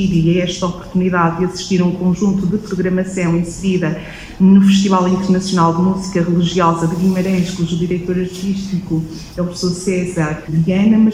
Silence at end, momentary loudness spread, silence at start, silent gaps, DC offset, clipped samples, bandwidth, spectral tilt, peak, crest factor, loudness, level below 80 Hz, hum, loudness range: 0 s; 9 LU; 0 s; none; under 0.1%; under 0.1%; 11 kHz; -6.5 dB/octave; 0 dBFS; 14 dB; -16 LUFS; -40 dBFS; none; 5 LU